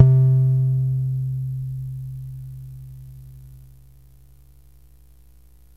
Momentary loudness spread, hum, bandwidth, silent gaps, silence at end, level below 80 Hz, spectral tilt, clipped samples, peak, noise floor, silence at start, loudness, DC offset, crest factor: 25 LU; 60 Hz at -50 dBFS; 1.2 kHz; none; 2.2 s; -48 dBFS; -11.5 dB/octave; under 0.1%; 0 dBFS; -51 dBFS; 0 s; -21 LUFS; 0.2%; 22 dB